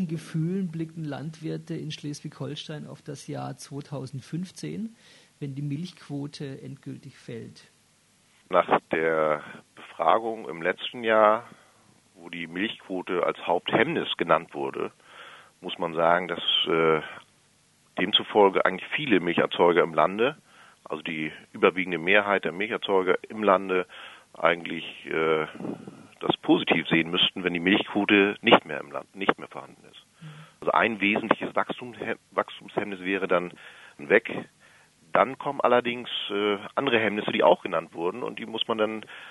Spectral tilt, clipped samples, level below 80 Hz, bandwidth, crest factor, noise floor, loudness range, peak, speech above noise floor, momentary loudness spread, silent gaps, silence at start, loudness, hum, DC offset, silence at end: -5.5 dB/octave; under 0.1%; -70 dBFS; 11.5 kHz; 26 dB; -63 dBFS; 12 LU; 0 dBFS; 37 dB; 18 LU; none; 0 s; -25 LUFS; none; under 0.1%; 0 s